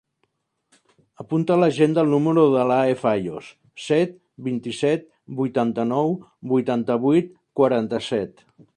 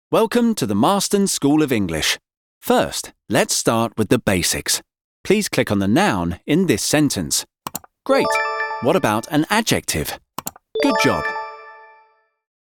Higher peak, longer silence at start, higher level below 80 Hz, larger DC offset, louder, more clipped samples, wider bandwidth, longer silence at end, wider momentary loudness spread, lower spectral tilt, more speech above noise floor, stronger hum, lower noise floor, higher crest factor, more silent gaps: about the same, -4 dBFS vs -2 dBFS; first, 1.2 s vs 0.1 s; second, -64 dBFS vs -48 dBFS; neither; about the same, -21 LUFS vs -19 LUFS; neither; second, 10.5 kHz vs 19 kHz; second, 0.45 s vs 0.8 s; about the same, 14 LU vs 12 LU; first, -7 dB/octave vs -4 dB/octave; first, 51 dB vs 39 dB; neither; first, -72 dBFS vs -57 dBFS; about the same, 18 dB vs 18 dB; second, none vs 2.37-2.61 s, 5.04-5.24 s